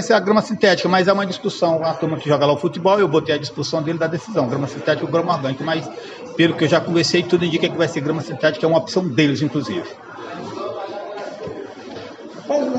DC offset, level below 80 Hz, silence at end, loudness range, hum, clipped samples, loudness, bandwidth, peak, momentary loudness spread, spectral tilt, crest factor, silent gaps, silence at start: under 0.1%; -62 dBFS; 0 s; 5 LU; none; under 0.1%; -19 LUFS; 9 kHz; -2 dBFS; 16 LU; -5.5 dB/octave; 16 dB; none; 0 s